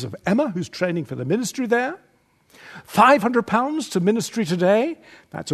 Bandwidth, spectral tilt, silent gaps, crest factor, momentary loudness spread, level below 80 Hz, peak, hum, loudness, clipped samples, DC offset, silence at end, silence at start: 13.5 kHz; -5.5 dB/octave; none; 20 dB; 15 LU; -62 dBFS; -2 dBFS; none; -21 LUFS; under 0.1%; under 0.1%; 0 s; 0 s